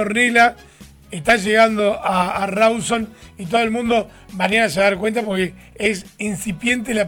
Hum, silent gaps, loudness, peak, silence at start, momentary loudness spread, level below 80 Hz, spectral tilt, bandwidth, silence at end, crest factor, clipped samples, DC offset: none; none; -18 LUFS; -4 dBFS; 0 s; 11 LU; -48 dBFS; -4 dB/octave; 19.5 kHz; 0 s; 16 dB; under 0.1%; under 0.1%